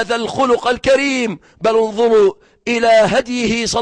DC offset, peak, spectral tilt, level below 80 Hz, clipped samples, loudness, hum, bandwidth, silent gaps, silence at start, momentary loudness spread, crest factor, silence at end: under 0.1%; -4 dBFS; -4 dB/octave; -46 dBFS; under 0.1%; -15 LUFS; none; 10 kHz; none; 0 s; 8 LU; 10 dB; 0 s